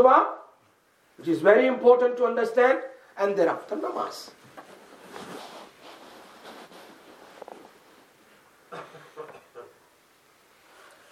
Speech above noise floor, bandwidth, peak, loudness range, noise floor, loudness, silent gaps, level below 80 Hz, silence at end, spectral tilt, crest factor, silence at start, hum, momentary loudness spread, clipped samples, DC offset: 41 dB; 13.5 kHz; -4 dBFS; 25 LU; -63 dBFS; -23 LUFS; none; -82 dBFS; 1.5 s; -5 dB/octave; 22 dB; 0 s; none; 27 LU; under 0.1%; under 0.1%